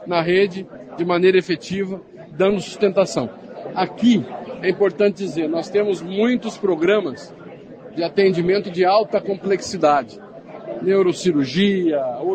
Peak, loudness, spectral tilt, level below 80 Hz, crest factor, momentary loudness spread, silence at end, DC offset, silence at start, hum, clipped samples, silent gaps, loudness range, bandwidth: -4 dBFS; -19 LUFS; -6 dB/octave; -60 dBFS; 16 dB; 17 LU; 0 s; under 0.1%; 0 s; none; under 0.1%; none; 1 LU; 9 kHz